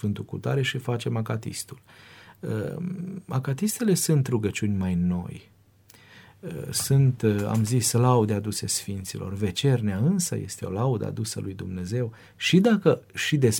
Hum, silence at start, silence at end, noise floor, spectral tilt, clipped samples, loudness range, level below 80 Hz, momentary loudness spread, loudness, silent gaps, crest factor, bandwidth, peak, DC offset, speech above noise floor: none; 0 s; 0 s; -55 dBFS; -5.5 dB/octave; under 0.1%; 5 LU; -58 dBFS; 13 LU; -25 LUFS; none; 20 dB; 18.5 kHz; -6 dBFS; under 0.1%; 30 dB